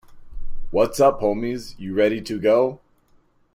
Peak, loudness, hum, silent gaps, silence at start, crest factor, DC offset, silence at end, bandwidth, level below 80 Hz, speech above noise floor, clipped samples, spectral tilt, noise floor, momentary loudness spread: -4 dBFS; -21 LUFS; none; none; 0.1 s; 18 dB; under 0.1%; 0.8 s; 15.5 kHz; -38 dBFS; 39 dB; under 0.1%; -5.5 dB/octave; -58 dBFS; 12 LU